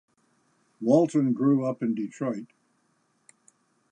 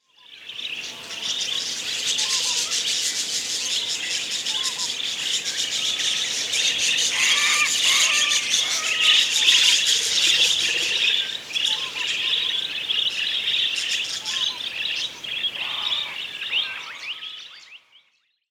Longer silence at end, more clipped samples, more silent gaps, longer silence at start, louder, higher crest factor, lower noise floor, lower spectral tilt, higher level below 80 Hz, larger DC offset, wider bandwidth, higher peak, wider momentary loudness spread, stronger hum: first, 1.45 s vs 0.75 s; neither; neither; first, 0.8 s vs 0.3 s; second, -26 LUFS vs -20 LUFS; about the same, 20 dB vs 20 dB; first, -70 dBFS vs -66 dBFS; first, -8.5 dB/octave vs 2.5 dB/octave; second, -80 dBFS vs -68 dBFS; neither; second, 10 kHz vs over 20 kHz; second, -8 dBFS vs -2 dBFS; about the same, 11 LU vs 13 LU; neither